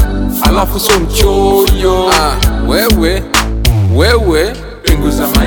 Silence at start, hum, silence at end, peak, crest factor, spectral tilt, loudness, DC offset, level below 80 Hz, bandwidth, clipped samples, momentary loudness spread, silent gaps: 0 s; none; 0 s; 0 dBFS; 10 dB; -4.5 dB/octave; -11 LUFS; under 0.1%; -14 dBFS; over 20 kHz; under 0.1%; 4 LU; none